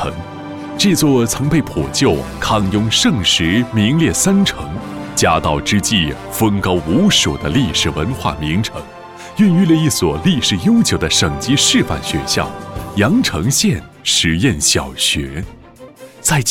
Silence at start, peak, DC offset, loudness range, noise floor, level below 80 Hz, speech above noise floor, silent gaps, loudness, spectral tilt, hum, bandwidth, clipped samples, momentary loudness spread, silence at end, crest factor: 0 s; -2 dBFS; under 0.1%; 2 LU; -38 dBFS; -34 dBFS; 23 dB; none; -14 LUFS; -4 dB/octave; none; 18 kHz; under 0.1%; 12 LU; 0 s; 14 dB